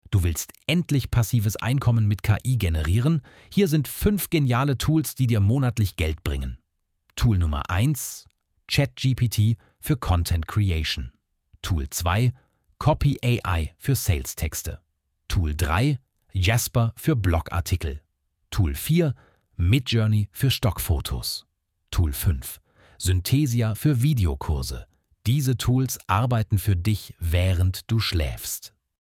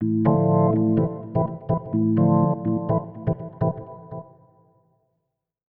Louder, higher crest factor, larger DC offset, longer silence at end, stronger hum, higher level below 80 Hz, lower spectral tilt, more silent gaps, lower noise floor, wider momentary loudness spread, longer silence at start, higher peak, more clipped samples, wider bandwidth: about the same, -24 LUFS vs -22 LUFS; about the same, 16 dB vs 16 dB; neither; second, 0.35 s vs 1.55 s; neither; first, -34 dBFS vs -52 dBFS; second, -5.5 dB/octave vs -14.5 dB/octave; neither; second, -69 dBFS vs -78 dBFS; second, 9 LU vs 17 LU; about the same, 0.1 s vs 0 s; about the same, -6 dBFS vs -6 dBFS; neither; first, 18.5 kHz vs 3 kHz